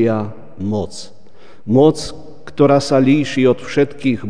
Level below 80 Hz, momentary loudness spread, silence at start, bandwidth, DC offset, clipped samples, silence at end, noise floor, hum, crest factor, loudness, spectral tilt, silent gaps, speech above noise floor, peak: -48 dBFS; 18 LU; 0 s; 10 kHz; 3%; under 0.1%; 0 s; -46 dBFS; none; 16 dB; -15 LUFS; -6.5 dB/octave; none; 32 dB; 0 dBFS